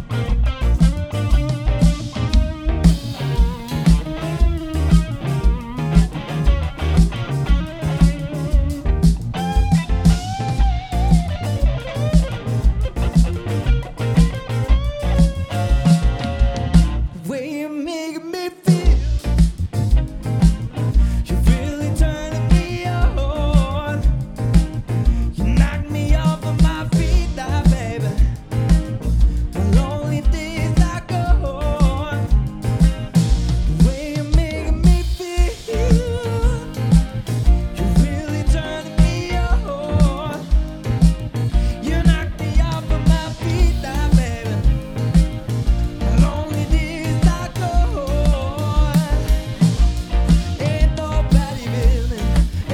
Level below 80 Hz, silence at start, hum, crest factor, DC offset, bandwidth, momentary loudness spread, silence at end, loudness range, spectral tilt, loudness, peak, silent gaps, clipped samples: -20 dBFS; 0 s; none; 16 dB; under 0.1%; 13 kHz; 6 LU; 0 s; 1 LU; -7 dB/octave; -19 LUFS; 0 dBFS; none; under 0.1%